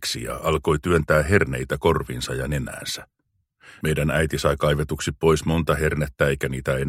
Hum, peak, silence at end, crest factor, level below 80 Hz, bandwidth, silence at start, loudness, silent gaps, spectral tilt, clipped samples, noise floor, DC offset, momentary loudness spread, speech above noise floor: none; -2 dBFS; 0 s; 20 dB; -36 dBFS; 16 kHz; 0 s; -23 LUFS; none; -5.5 dB/octave; under 0.1%; -64 dBFS; under 0.1%; 8 LU; 42 dB